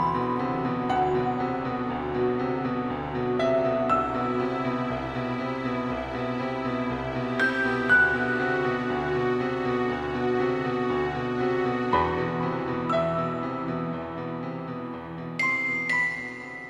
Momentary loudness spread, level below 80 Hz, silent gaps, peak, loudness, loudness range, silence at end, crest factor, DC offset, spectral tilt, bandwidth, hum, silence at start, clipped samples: 7 LU; -50 dBFS; none; -10 dBFS; -27 LUFS; 4 LU; 0 s; 18 dB; under 0.1%; -7 dB/octave; 11 kHz; none; 0 s; under 0.1%